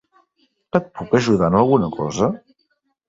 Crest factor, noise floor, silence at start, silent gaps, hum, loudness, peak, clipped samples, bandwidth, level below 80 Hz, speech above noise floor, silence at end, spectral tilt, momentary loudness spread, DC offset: 20 dB; -69 dBFS; 0.75 s; none; none; -19 LUFS; 0 dBFS; under 0.1%; 8 kHz; -48 dBFS; 51 dB; 0.75 s; -6.5 dB/octave; 7 LU; under 0.1%